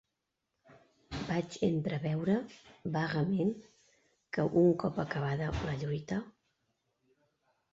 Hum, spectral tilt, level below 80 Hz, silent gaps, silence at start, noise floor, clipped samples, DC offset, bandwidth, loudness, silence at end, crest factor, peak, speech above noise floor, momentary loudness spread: none; -7.5 dB/octave; -56 dBFS; none; 1.1 s; -85 dBFS; under 0.1%; under 0.1%; 7.8 kHz; -33 LUFS; 1.4 s; 20 dB; -16 dBFS; 53 dB; 14 LU